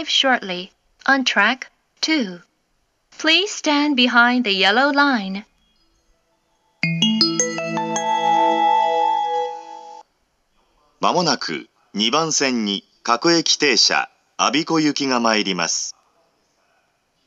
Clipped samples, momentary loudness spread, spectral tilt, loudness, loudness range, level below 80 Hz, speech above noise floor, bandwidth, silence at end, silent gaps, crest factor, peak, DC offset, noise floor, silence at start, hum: under 0.1%; 14 LU; -2.5 dB/octave; -18 LUFS; 4 LU; -72 dBFS; 49 dB; 11.5 kHz; 1.35 s; none; 20 dB; 0 dBFS; under 0.1%; -67 dBFS; 0 s; none